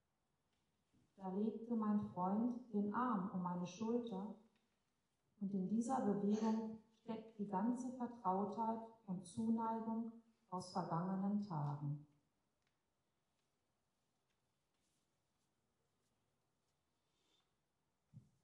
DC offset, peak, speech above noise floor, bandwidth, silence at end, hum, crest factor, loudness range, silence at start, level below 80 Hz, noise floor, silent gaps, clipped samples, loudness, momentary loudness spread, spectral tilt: under 0.1%; -28 dBFS; 46 dB; 11 kHz; 0.25 s; none; 18 dB; 5 LU; 1.2 s; -86 dBFS; -88 dBFS; none; under 0.1%; -43 LUFS; 11 LU; -8 dB/octave